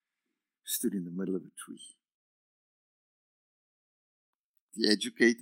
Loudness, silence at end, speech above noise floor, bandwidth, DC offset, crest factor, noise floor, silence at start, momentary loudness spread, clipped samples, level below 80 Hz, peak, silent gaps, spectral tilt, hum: -31 LUFS; 0 s; 57 dB; 16 kHz; under 0.1%; 28 dB; -88 dBFS; 0.65 s; 22 LU; under 0.1%; under -90 dBFS; -6 dBFS; 2.14-4.54 s, 4.60-4.69 s; -3.5 dB/octave; none